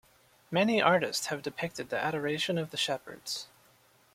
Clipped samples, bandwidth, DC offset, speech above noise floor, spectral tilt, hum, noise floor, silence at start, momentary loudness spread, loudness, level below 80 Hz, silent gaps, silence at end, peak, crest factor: under 0.1%; 16.5 kHz; under 0.1%; 33 dB; -4 dB/octave; none; -64 dBFS; 0.5 s; 12 LU; -31 LUFS; -70 dBFS; none; 0.7 s; -8 dBFS; 24 dB